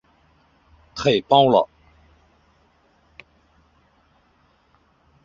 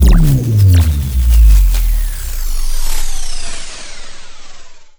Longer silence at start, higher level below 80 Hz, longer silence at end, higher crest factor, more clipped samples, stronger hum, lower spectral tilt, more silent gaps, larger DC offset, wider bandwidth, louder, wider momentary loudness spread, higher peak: first, 0.95 s vs 0 s; second, -58 dBFS vs -12 dBFS; first, 3.6 s vs 0.1 s; first, 22 dB vs 10 dB; neither; neither; about the same, -5.5 dB/octave vs -5.5 dB/octave; neither; neither; second, 7.6 kHz vs over 20 kHz; second, -18 LUFS vs -14 LUFS; about the same, 16 LU vs 18 LU; about the same, -2 dBFS vs 0 dBFS